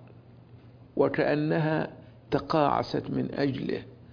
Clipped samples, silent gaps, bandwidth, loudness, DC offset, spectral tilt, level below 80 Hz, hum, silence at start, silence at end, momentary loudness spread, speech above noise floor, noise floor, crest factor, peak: under 0.1%; none; 5.4 kHz; -28 LUFS; under 0.1%; -8.5 dB/octave; -58 dBFS; none; 0 s; 0 s; 9 LU; 24 dB; -51 dBFS; 20 dB; -10 dBFS